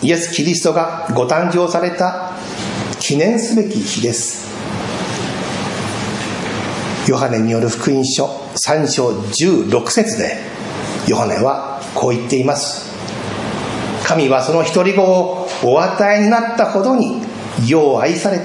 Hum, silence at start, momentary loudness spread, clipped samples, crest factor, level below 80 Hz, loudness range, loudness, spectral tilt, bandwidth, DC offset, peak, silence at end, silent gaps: none; 0 s; 10 LU; under 0.1%; 16 dB; -52 dBFS; 5 LU; -16 LUFS; -4.5 dB/octave; 11.5 kHz; under 0.1%; 0 dBFS; 0 s; none